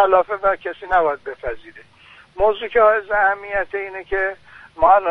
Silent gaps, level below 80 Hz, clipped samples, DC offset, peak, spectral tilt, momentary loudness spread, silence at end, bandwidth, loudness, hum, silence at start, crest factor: none; -42 dBFS; under 0.1%; under 0.1%; -2 dBFS; -6 dB/octave; 14 LU; 0 s; 5.2 kHz; -19 LUFS; none; 0 s; 18 dB